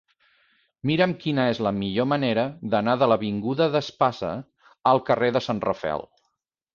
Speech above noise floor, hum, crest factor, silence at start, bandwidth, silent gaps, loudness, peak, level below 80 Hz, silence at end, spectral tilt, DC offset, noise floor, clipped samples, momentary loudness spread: 54 dB; none; 18 dB; 0.85 s; 7.2 kHz; none; -24 LUFS; -6 dBFS; -58 dBFS; 0.7 s; -7 dB/octave; under 0.1%; -77 dBFS; under 0.1%; 9 LU